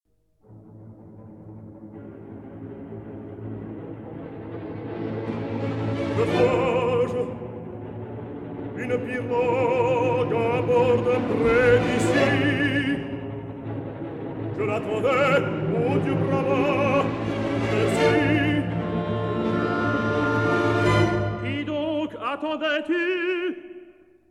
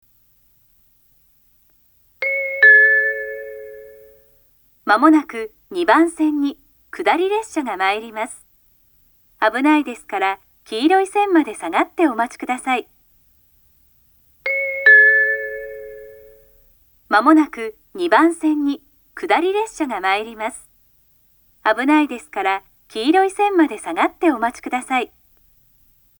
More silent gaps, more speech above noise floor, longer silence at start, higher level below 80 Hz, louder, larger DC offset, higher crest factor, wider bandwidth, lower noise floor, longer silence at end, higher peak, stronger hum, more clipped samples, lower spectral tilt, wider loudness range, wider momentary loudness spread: neither; about the same, 40 dB vs 39 dB; second, 0.5 s vs 2.2 s; first, -50 dBFS vs -60 dBFS; second, -23 LUFS vs -17 LUFS; neither; about the same, 18 dB vs 20 dB; second, 12 kHz vs over 20 kHz; about the same, -60 dBFS vs -57 dBFS; second, 0.4 s vs 1.15 s; second, -6 dBFS vs 0 dBFS; neither; neither; first, -7 dB/octave vs -2.5 dB/octave; first, 15 LU vs 6 LU; about the same, 17 LU vs 17 LU